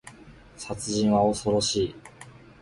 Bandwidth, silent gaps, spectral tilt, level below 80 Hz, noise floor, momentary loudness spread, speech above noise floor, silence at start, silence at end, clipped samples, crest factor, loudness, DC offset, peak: 11.5 kHz; none; -4.5 dB/octave; -52 dBFS; -49 dBFS; 20 LU; 24 dB; 0.05 s; 0.3 s; under 0.1%; 18 dB; -25 LUFS; under 0.1%; -10 dBFS